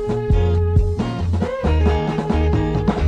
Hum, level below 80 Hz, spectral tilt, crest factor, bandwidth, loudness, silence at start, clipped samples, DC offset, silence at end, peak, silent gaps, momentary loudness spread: none; -22 dBFS; -8.5 dB/octave; 14 dB; 7.8 kHz; -19 LUFS; 0 s; under 0.1%; under 0.1%; 0 s; -4 dBFS; none; 4 LU